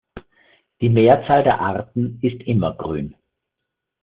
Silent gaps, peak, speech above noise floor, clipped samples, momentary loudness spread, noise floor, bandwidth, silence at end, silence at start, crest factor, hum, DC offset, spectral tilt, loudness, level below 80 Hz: none; -2 dBFS; 63 dB; under 0.1%; 13 LU; -81 dBFS; 4.8 kHz; 0.9 s; 0.15 s; 18 dB; none; under 0.1%; -6.5 dB/octave; -19 LUFS; -50 dBFS